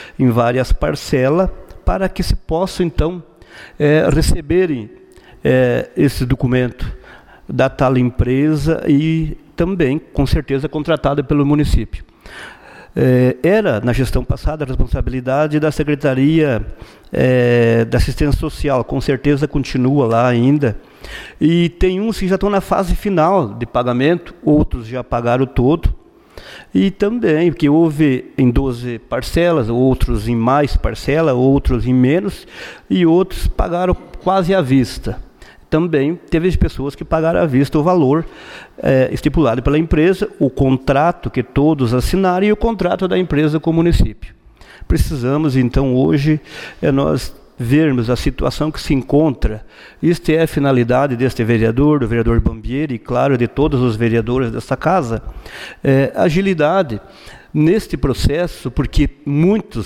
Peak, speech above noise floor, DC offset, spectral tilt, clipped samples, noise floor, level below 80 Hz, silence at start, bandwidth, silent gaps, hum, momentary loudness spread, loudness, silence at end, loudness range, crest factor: -4 dBFS; 26 dB; under 0.1%; -7.5 dB/octave; under 0.1%; -41 dBFS; -26 dBFS; 0 s; 15.5 kHz; none; none; 8 LU; -16 LUFS; 0 s; 2 LU; 12 dB